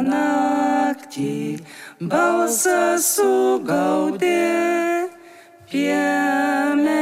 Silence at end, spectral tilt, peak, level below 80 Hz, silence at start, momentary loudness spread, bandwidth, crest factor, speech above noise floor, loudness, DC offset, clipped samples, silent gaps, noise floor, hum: 0 s; -4 dB/octave; -6 dBFS; -66 dBFS; 0 s; 10 LU; 16 kHz; 14 dB; 26 dB; -19 LUFS; under 0.1%; under 0.1%; none; -45 dBFS; none